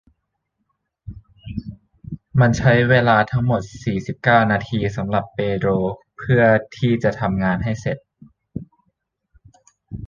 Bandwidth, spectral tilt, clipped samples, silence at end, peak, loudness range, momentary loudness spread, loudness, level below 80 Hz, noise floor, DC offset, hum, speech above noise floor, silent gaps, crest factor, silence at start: 7.4 kHz; -7.5 dB/octave; under 0.1%; 0 s; 0 dBFS; 3 LU; 21 LU; -19 LUFS; -44 dBFS; -74 dBFS; under 0.1%; none; 56 dB; none; 20 dB; 1.05 s